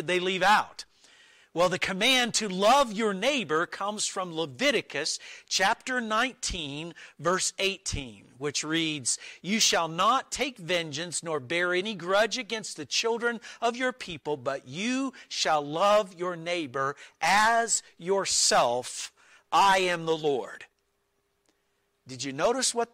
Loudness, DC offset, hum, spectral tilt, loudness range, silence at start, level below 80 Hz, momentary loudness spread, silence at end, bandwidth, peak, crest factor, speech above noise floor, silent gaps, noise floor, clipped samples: -27 LUFS; under 0.1%; none; -2 dB/octave; 4 LU; 0 s; -56 dBFS; 12 LU; 0.1 s; 16 kHz; -12 dBFS; 16 dB; 47 dB; none; -74 dBFS; under 0.1%